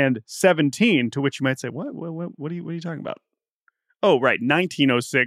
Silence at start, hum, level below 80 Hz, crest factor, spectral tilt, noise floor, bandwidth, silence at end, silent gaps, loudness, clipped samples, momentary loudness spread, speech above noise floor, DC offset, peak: 0 s; none; -76 dBFS; 18 dB; -5 dB/octave; -69 dBFS; 15 kHz; 0 s; 3.51-3.61 s; -22 LUFS; under 0.1%; 13 LU; 47 dB; under 0.1%; -4 dBFS